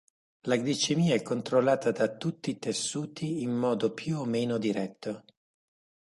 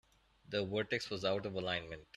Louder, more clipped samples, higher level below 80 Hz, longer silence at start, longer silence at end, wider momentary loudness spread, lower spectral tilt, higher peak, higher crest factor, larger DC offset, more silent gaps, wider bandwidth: first, -29 LUFS vs -38 LUFS; neither; about the same, -72 dBFS vs -68 dBFS; about the same, 0.45 s vs 0.5 s; first, 0.95 s vs 0.15 s; first, 9 LU vs 4 LU; about the same, -5 dB/octave vs -5 dB/octave; first, -12 dBFS vs -20 dBFS; about the same, 18 dB vs 18 dB; neither; neither; second, 11.5 kHz vs 13.5 kHz